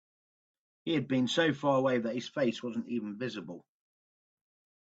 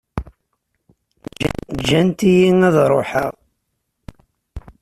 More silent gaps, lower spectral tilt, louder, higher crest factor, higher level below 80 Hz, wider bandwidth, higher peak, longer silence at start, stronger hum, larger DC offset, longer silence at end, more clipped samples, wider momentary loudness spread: neither; about the same, -5.5 dB/octave vs -6.5 dB/octave; second, -31 LUFS vs -16 LUFS; about the same, 20 dB vs 16 dB; second, -76 dBFS vs -42 dBFS; second, 8 kHz vs 14 kHz; second, -14 dBFS vs -2 dBFS; first, 0.85 s vs 0.15 s; neither; neither; first, 1.2 s vs 0.2 s; neither; second, 15 LU vs 25 LU